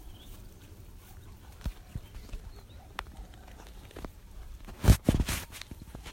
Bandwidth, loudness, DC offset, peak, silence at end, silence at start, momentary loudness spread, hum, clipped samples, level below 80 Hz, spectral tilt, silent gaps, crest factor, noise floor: 16 kHz; -31 LUFS; under 0.1%; -8 dBFS; 0 s; 0 s; 25 LU; none; under 0.1%; -38 dBFS; -5.5 dB/octave; none; 26 dB; -49 dBFS